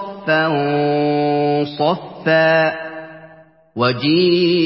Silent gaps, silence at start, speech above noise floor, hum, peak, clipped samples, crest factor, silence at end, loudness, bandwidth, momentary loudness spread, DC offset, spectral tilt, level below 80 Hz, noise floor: none; 0 s; 30 dB; none; -2 dBFS; under 0.1%; 14 dB; 0 s; -16 LUFS; 5.8 kHz; 15 LU; under 0.1%; -10.5 dB/octave; -60 dBFS; -46 dBFS